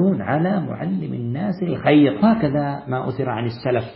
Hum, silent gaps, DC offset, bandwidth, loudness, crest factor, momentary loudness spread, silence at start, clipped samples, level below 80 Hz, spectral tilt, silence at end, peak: none; none; under 0.1%; 5.6 kHz; -20 LUFS; 16 dB; 10 LU; 0 s; under 0.1%; -52 dBFS; -12.5 dB/octave; 0 s; -2 dBFS